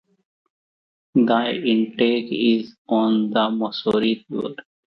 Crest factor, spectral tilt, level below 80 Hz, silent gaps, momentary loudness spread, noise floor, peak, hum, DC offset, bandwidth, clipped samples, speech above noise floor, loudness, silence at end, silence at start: 18 dB; -7.5 dB/octave; -66 dBFS; 2.78-2.85 s; 6 LU; under -90 dBFS; -4 dBFS; none; under 0.1%; 5.8 kHz; under 0.1%; over 70 dB; -21 LUFS; 0.3 s; 1.15 s